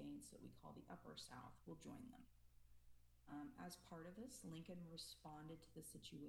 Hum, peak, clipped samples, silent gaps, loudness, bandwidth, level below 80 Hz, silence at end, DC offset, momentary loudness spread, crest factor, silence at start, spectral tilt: none; -44 dBFS; under 0.1%; none; -58 LUFS; 19.5 kHz; -76 dBFS; 0 s; under 0.1%; 5 LU; 14 dB; 0 s; -4.5 dB/octave